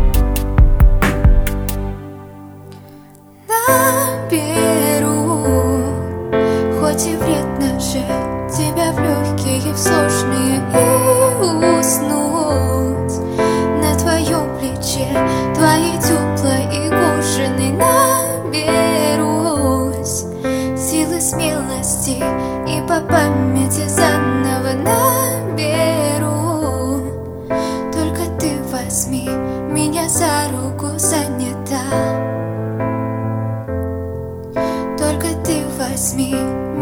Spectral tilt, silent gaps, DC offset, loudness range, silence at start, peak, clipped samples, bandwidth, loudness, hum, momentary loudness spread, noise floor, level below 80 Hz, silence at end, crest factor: -5 dB/octave; none; under 0.1%; 5 LU; 0 s; 0 dBFS; under 0.1%; over 20 kHz; -16 LUFS; none; 8 LU; -41 dBFS; -24 dBFS; 0 s; 16 dB